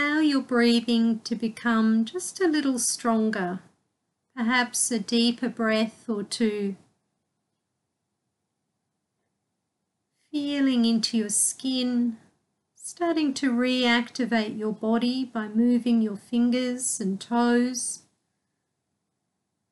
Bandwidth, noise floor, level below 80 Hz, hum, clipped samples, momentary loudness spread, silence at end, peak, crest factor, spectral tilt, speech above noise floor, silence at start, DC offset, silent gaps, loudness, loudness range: 12.5 kHz; -80 dBFS; -76 dBFS; none; under 0.1%; 8 LU; 1.75 s; -8 dBFS; 18 dB; -3 dB/octave; 56 dB; 0 s; under 0.1%; none; -25 LUFS; 6 LU